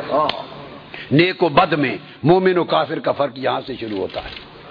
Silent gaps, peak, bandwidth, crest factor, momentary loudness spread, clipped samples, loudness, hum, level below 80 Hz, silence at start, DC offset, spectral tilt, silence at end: none; 0 dBFS; 5.2 kHz; 18 dB; 18 LU; under 0.1%; -18 LUFS; none; -50 dBFS; 0 s; under 0.1%; -8.5 dB/octave; 0 s